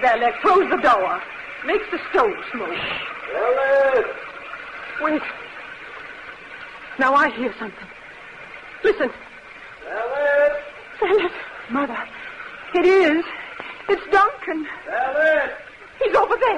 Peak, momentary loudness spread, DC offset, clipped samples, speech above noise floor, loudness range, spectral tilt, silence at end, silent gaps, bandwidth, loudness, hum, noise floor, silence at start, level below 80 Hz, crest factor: -6 dBFS; 20 LU; under 0.1%; under 0.1%; 21 dB; 4 LU; -4.5 dB/octave; 0 s; none; 10 kHz; -20 LUFS; none; -40 dBFS; 0 s; -54 dBFS; 16 dB